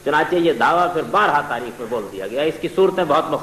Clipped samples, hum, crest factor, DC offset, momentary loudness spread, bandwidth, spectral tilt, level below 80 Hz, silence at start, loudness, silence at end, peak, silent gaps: under 0.1%; 50 Hz at -50 dBFS; 12 dB; under 0.1%; 10 LU; 14 kHz; -5 dB/octave; -56 dBFS; 0 s; -19 LUFS; 0 s; -6 dBFS; none